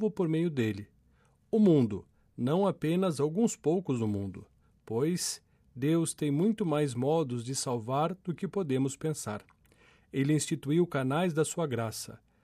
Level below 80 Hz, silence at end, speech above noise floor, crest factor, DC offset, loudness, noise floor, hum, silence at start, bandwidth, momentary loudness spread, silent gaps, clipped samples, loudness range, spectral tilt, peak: -68 dBFS; 0.25 s; 37 dB; 16 dB; under 0.1%; -30 LUFS; -66 dBFS; none; 0 s; 15.5 kHz; 9 LU; none; under 0.1%; 3 LU; -6 dB/octave; -14 dBFS